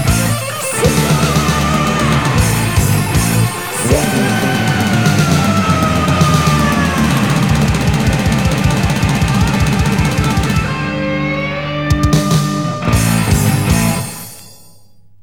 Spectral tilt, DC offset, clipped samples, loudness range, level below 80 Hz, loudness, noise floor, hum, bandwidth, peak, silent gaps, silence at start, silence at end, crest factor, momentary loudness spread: -5 dB/octave; 0.9%; under 0.1%; 2 LU; -26 dBFS; -13 LUFS; -48 dBFS; none; 19.5 kHz; -2 dBFS; none; 0 s; 0.75 s; 12 dB; 5 LU